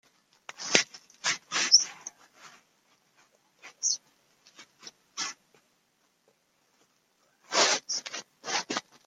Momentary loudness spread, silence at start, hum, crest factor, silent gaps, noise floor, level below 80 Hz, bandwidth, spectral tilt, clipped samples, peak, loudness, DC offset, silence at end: 25 LU; 0.6 s; none; 30 dB; none; -72 dBFS; -84 dBFS; 15 kHz; 1 dB/octave; under 0.1%; -2 dBFS; -27 LUFS; under 0.1%; 0.25 s